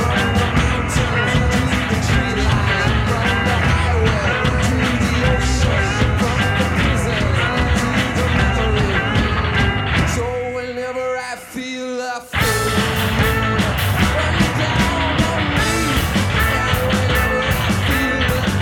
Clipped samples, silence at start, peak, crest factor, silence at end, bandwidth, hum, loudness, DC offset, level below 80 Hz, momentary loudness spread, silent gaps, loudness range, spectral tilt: under 0.1%; 0 s; -2 dBFS; 14 dB; 0 s; 20 kHz; none; -17 LUFS; under 0.1%; -26 dBFS; 6 LU; none; 3 LU; -5 dB/octave